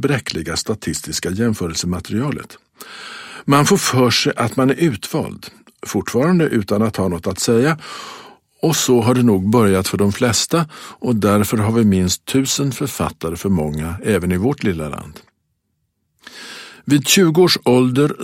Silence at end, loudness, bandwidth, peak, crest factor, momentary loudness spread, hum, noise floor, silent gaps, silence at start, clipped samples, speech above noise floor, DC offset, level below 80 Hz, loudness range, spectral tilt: 0 s; -17 LUFS; 16.5 kHz; 0 dBFS; 18 dB; 16 LU; none; -70 dBFS; none; 0 s; under 0.1%; 53 dB; under 0.1%; -46 dBFS; 6 LU; -5 dB/octave